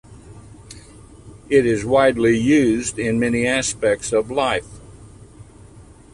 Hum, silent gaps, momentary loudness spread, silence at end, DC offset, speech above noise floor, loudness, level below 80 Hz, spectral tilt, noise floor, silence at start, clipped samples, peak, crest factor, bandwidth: none; none; 6 LU; 0.35 s; under 0.1%; 26 dB; -18 LUFS; -46 dBFS; -4.5 dB/octave; -44 dBFS; 0.1 s; under 0.1%; -4 dBFS; 18 dB; 11.5 kHz